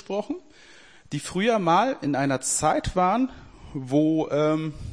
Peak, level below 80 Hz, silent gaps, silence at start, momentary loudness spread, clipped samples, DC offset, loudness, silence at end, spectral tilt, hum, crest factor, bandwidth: -8 dBFS; -46 dBFS; none; 0.1 s; 14 LU; under 0.1%; 0.2%; -24 LUFS; 0 s; -5 dB/octave; none; 16 dB; 10.5 kHz